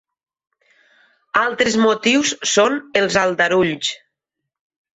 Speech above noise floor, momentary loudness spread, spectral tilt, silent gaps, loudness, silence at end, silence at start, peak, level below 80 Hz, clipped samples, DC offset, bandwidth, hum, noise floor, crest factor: 64 dB; 6 LU; -3 dB/octave; none; -17 LUFS; 1 s; 1.35 s; -2 dBFS; -58 dBFS; under 0.1%; under 0.1%; 8.4 kHz; none; -81 dBFS; 16 dB